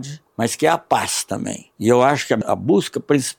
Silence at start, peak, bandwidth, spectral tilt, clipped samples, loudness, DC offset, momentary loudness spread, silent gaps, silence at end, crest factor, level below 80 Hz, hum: 0 s; -2 dBFS; 18 kHz; -4.5 dB/octave; under 0.1%; -19 LUFS; under 0.1%; 10 LU; none; 0.05 s; 16 dB; -60 dBFS; none